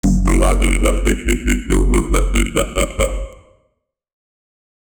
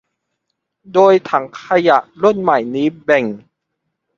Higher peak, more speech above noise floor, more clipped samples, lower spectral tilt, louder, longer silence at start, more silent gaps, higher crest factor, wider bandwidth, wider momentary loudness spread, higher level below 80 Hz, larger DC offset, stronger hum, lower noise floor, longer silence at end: about the same, 0 dBFS vs 0 dBFS; second, 53 dB vs 60 dB; neither; second, -5 dB/octave vs -6.5 dB/octave; about the same, -17 LUFS vs -15 LUFS; second, 0.05 s vs 0.9 s; neither; about the same, 16 dB vs 16 dB; first, 20 kHz vs 7.4 kHz; second, 5 LU vs 8 LU; first, -18 dBFS vs -62 dBFS; neither; neither; second, -68 dBFS vs -74 dBFS; first, 1.65 s vs 0.8 s